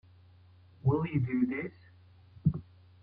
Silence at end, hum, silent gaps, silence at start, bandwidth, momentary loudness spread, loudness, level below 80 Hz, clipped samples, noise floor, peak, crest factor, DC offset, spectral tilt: 0.4 s; none; none; 0.85 s; 4.7 kHz; 11 LU; -32 LUFS; -58 dBFS; under 0.1%; -58 dBFS; -14 dBFS; 20 dB; under 0.1%; -12 dB/octave